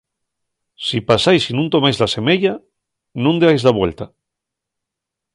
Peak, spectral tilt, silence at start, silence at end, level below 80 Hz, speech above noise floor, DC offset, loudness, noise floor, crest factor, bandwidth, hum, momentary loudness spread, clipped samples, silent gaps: 0 dBFS; -5.5 dB/octave; 0.8 s; 1.3 s; -48 dBFS; 67 dB; under 0.1%; -16 LUFS; -82 dBFS; 18 dB; 11.5 kHz; none; 17 LU; under 0.1%; none